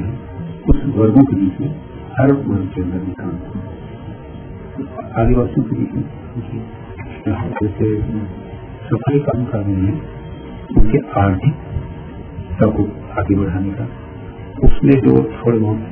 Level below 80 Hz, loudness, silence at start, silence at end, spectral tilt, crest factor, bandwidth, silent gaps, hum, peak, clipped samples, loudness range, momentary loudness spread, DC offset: -26 dBFS; -18 LUFS; 0 s; 0 s; -13 dB/octave; 16 dB; 3.4 kHz; none; none; 0 dBFS; 0.2%; 5 LU; 18 LU; under 0.1%